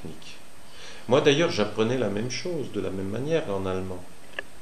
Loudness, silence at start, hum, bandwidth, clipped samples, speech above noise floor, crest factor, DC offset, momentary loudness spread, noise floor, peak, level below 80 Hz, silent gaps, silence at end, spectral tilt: -26 LUFS; 0 s; none; 14 kHz; under 0.1%; 23 dB; 20 dB; 2%; 22 LU; -48 dBFS; -8 dBFS; -60 dBFS; none; 0 s; -5 dB/octave